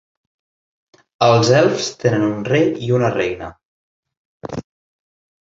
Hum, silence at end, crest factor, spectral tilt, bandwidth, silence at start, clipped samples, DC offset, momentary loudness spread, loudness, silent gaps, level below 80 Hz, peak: none; 0.8 s; 18 dB; -5.5 dB/octave; 8 kHz; 1.2 s; under 0.1%; under 0.1%; 17 LU; -16 LUFS; 3.65-4.03 s, 4.17-4.41 s; -52 dBFS; 0 dBFS